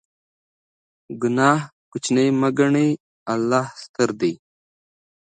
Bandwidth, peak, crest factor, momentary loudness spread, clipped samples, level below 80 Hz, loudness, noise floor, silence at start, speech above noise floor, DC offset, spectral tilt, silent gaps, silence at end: 9.4 kHz; -2 dBFS; 20 dB; 12 LU; under 0.1%; -68 dBFS; -21 LUFS; under -90 dBFS; 1.1 s; over 70 dB; under 0.1%; -5.5 dB/octave; 1.72-1.92 s, 3.00-3.26 s, 3.89-3.94 s; 0.9 s